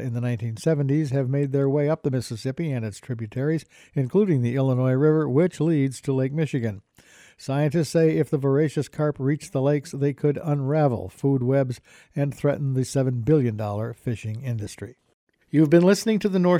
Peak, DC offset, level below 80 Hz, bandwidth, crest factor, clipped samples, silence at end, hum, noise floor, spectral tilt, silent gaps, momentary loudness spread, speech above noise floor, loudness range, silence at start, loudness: -6 dBFS; under 0.1%; -58 dBFS; 14.5 kHz; 18 dB; under 0.1%; 0 s; none; -53 dBFS; -7.5 dB/octave; 15.14-15.27 s; 10 LU; 30 dB; 3 LU; 0 s; -23 LUFS